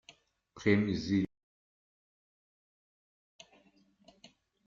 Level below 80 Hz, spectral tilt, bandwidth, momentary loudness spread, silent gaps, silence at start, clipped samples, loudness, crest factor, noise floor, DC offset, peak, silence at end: -66 dBFS; -7 dB/octave; 7.4 kHz; 6 LU; none; 0.55 s; under 0.1%; -32 LUFS; 26 dB; -67 dBFS; under 0.1%; -12 dBFS; 3.4 s